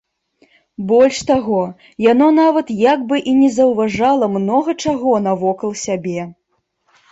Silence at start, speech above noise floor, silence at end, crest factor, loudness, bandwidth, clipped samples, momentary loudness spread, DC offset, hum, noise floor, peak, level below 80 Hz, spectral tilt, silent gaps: 0.8 s; 50 dB; 0.8 s; 14 dB; -15 LUFS; 8.2 kHz; under 0.1%; 10 LU; under 0.1%; none; -65 dBFS; -2 dBFS; -54 dBFS; -5.5 dB/octave; none